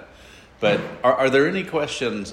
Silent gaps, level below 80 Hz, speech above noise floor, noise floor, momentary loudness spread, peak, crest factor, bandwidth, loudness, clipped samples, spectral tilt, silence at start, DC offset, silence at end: none; -54 dBFS; 26 dB; -47 dBFS; 7 LU; -6 dBFS; 16 dB; 12.5 kHz; -21 LUFS; under 0.1%; -5 dB/octave; 0 s; under 0.1%; 0 s